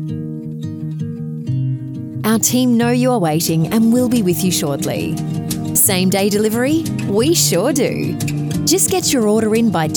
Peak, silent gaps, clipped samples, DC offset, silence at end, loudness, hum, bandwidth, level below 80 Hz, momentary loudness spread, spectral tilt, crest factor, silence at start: -2 dBFS; none; under 0.1%; under 0.1%; 0 s; -16 LUFS; none; over 20 kHz; -48 dBFS; 12 LU; -4.5 dB/octave; 14 dB; 0 s